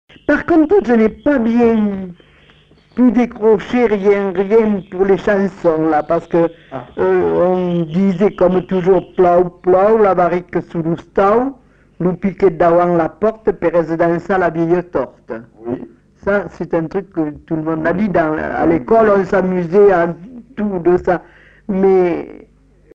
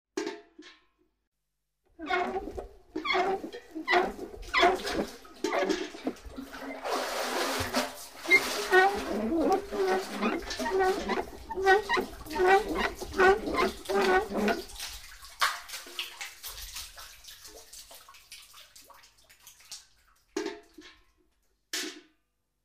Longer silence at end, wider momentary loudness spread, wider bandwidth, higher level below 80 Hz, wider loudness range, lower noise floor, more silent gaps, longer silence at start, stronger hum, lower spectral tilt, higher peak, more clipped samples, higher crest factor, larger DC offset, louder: about the same, 0.65 s vs 0.65 s; second, 11 LU vs 22 LU; second, 7.4 kHz vs 15.5 kHz; first, -42 dBFS vs -54 dBFS; second, 4 LU vs 18 LU; second, -48 dBFS vs -84 dBFS; second, none vs 1.27-1.32 s; first, 0.3 s vs 0.15 s; neither; first, -9 dB/octave vs -3 dB/octave; first, -2 dBFS vs -10 dBFS; neither; second, 12 dB vs 22 dB; neither; first, -15 LUFS vs -29 LUFS